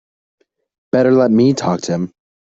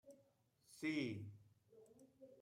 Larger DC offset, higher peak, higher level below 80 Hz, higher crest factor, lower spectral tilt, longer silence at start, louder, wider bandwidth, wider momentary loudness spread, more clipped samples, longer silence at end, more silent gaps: neither; first, -2 dBFS vs -32 dBFS; first, -58 dBFS vs -88 dBFS; second, 14 dB vs 20 dB; about the same, -6.5 dB/octave vs -5.5 dB/octave; first, 0.95 s vs 0.05 s; first, -15 LUFS vs -46 LUFS; second, 7.8 kHz vs 15.5 kHz; second, 10 LU vs 25 LU; neither; first, 0.45 s vs 0 s; neither